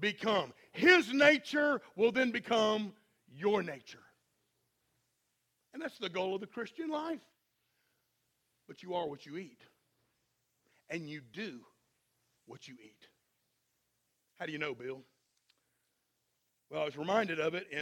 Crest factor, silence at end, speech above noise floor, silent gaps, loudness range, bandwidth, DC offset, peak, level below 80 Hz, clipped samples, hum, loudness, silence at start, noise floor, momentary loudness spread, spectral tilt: 26 dB; 0 s; 48 dB; none; 19 LU; 16 kHz; under 0.1%; -10 dBFS; -82 dBFS; under 0.1%; none; -33 LUFS; 0 s; -81 dBFS; 21 LU; -4.5 dB/octave